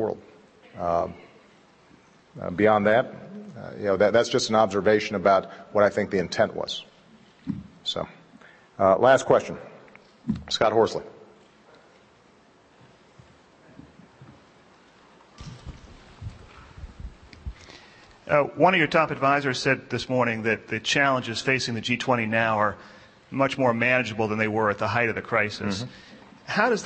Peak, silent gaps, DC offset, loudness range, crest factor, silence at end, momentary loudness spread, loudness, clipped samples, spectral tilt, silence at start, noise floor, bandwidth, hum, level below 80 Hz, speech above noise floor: -4 dBFS; none; under 0.1%; 7 LU; 22 dB; 0 s; 22 LU; -23 LUFS; under 0.1%; -5 dB/octave; 0 s; -57 dBFS; 8.8 kHz; none; -54 dBFS; 33 dB